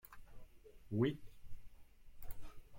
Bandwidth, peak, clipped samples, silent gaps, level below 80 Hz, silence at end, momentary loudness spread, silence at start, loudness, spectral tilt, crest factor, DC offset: 16.5 kHz; -22 dBFS; under 0.1%; none; -58 dBFS; 0 s; 26 LU; 0.05 s; -40 LUFS; -8 dB/octave; 22 dB; under 0.1%